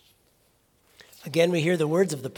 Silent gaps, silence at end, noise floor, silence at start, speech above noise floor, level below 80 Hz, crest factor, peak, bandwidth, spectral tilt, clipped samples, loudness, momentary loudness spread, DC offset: none; 0.05 s; -65 dBFS; 1.25 s; 42 dB; -72 dBFS; 20 dB; -8 dBFS; 18 kHz; -5.5 dB/octave; under 0.1%; -24 LUFS; 7 LU; under 0.1%